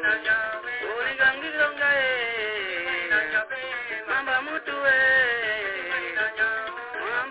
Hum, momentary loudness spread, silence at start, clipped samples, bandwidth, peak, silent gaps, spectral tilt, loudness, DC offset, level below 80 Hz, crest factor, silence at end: none; 10 LU; 0 s; under 0.1%; 4 kHz; -10 dBFS; none; 1.5 dB/octave; -24 LUFS; under 0.1%; -62 dBFS; 16 dB; 0 s